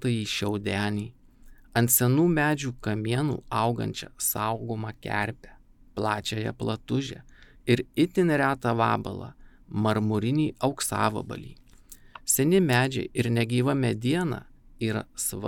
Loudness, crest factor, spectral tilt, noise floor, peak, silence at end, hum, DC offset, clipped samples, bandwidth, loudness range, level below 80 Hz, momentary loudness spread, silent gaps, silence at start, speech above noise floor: -26 LUFS; 20 dB; -5 dB/octave; -51 dBFS; -6 dBFS; 0 s; none; under 0.1%; under 0.1%; 19 kHz; 5 LU; -54 dBFS; 14 LU; none; 0 s; 25 dB